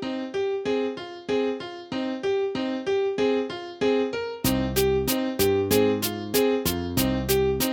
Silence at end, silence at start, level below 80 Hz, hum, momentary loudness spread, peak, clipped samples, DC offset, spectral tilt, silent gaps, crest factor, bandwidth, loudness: 0 s; 0 s; -44 dBFS; none; 8 LU; -8 dBFS; under 0.1%; under 0.1%; -4.5 dB/octave; none; 16 dB; 17.5 kHz; -25 LUFS